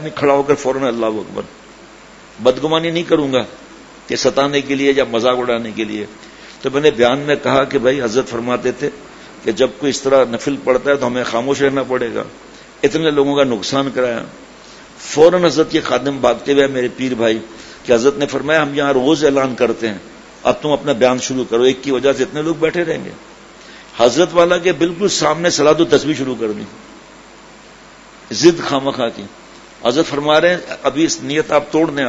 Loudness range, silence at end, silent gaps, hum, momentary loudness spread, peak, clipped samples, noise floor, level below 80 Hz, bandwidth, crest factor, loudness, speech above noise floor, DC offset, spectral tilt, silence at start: 3 LU; 0 s; none; none; 12 LU; 0 dBFS; under 0.1%; -40 dBFS; -50 dBFS; 8 kHz; 16 dB; -15 LUFS; 25 dB; under 0.1%; -4.5 dB/octave; 0 s